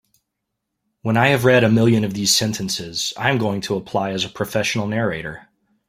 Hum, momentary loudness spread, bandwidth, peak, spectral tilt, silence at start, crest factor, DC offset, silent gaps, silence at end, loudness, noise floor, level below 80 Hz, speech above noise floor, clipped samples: none; 10 LU; 16 kHz; -2 dBFS; -4.5 dB/octave; 1.05 s; 18 dB; under 0.1%; none; 0.5 s; -19 LUFS; -79 dBFS; -54 dBFS; 60 dB; under 0.1%